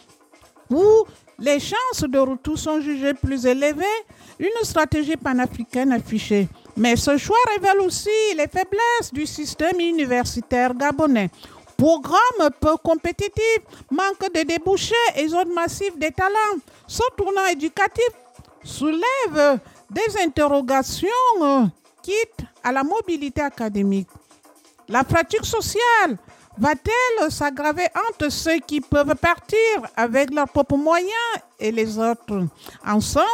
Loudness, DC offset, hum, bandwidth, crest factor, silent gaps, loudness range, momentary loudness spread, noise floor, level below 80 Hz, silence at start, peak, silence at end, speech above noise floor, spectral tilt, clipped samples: -20 LUFS; under 0.1%; none; 17 kHz; 14 dB; none; 3 LU; 8 LU; -53 dBFS; -44 dBFS; 0.7 s; -6 dBFS; 0 s; 32 dB; -4.5 dB/octave; under 0.1%